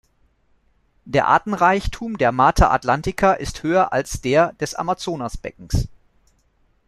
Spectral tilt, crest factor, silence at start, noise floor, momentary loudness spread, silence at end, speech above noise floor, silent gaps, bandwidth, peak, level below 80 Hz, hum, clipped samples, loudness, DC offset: -5.5 dB/octave; 18 dB; 1.05 s; -61 dBFS; 11 LU; 1 s; 42 dB; none; 13.5 kHz; -2 dBFS; -32 dBFS; none; under 0.1%; -19 LUFS; under 0.1%